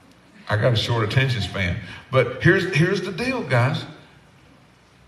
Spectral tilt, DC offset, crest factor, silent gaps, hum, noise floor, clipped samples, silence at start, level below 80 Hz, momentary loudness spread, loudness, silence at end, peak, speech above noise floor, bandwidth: -6 dB/octave; under 0.1%; 22 dB; none; none; -53 dBFS; under 0.1%; 0.4 s; -50 dBFS; 9 LU; -21 LUFS; 1.1 s; -2 dBFS; 32 dB; 12.5 kHz